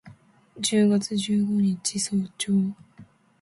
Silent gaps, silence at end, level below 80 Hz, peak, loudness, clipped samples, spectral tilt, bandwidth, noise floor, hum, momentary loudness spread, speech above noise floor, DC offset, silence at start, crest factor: none; 0.4 s; -64 dBFS; -10 dBFS; -24 LUFS; under 0.1%; -5 dB/octave; 11.5 kHz; -52 dBFS; none; 7 LU; 28 dB; under 0.1%; 0.05 s; 16 dB